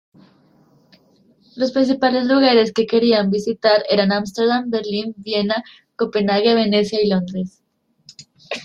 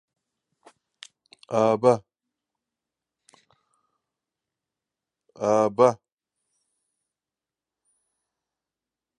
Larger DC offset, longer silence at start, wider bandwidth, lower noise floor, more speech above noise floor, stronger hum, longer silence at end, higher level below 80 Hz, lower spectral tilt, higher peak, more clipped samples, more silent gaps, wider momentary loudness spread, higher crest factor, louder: neither; about the same, 1.55 s vs 1.5 s; about the same, 9.6 kHz vs 10 kHz; second, -56 dBFS vs under -90 dBFS; second, 38 dB vs over 70 dB; neither; second, 0 s vs 3.25 s; first, -60 dBFS vs -74 dBFS; about the same, -6 dB/octave vs -6.5 dB/octave; about the same, -2 dBFS vs -4 dBFS; neither; neither; about the same, 10 LU vs 10 LU; second, 18 dB vs 24 dB; first, -18 LUFS vs -22 LUFS